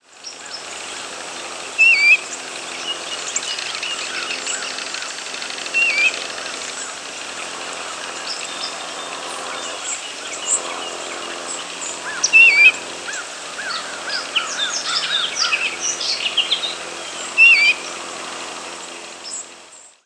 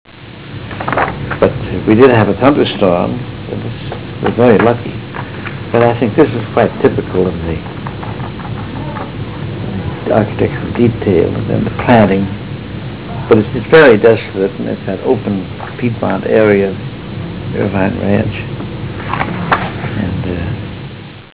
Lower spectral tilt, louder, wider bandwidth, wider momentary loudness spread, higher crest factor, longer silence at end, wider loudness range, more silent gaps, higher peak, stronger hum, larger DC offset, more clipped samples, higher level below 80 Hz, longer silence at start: second, 1.5 dB/octave vs -11 dB/octave; second, -18 LUFS vs -14 LUFS; first, 11 kHz vs 4 kHz; first, 18 LU vs 15 LU; first, 20 dB vs 14 dB; first, 0.2 s vs 0.05 s; first, 10 LU vs 6 LU; neither; about the same, 0 dBFS vs 0 dBFS; neither; second, under 0.1% vs 0.8%; neither; second, -70 dBFS vs -34 dBFS; about the same, 0.1 s vs 0.05 s